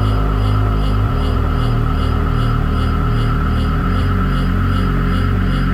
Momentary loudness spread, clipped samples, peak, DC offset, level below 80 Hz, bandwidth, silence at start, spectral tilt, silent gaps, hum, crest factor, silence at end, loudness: 1 LU; under 0.1%; -4 dBFS; under 0.1%; -18 dBFS; 14.5 kHz; 0 s; -8 dB/octave; none; none; 10 dB; 0 s; -17 LUFS